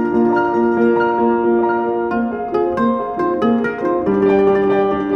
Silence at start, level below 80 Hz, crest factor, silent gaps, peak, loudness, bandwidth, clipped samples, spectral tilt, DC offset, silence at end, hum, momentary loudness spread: 0 s; -46 dBFS; 12 dB; none; -4 dBFS; -16 LUFS; 6 kHz; under 0.1%; -8.5 dB/octave; under 0.1%; 0 s; none; 5 LU